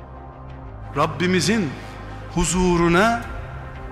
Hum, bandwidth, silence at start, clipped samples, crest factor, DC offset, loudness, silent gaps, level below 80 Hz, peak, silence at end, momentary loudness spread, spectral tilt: none; 13.5 kHz; 0 s; under 0.1%; 16 dB; under 0.1%; -20 LUFS; none; -34 dBFS; -6 dBFS; 0 s; 21 LU; -5 dB/octave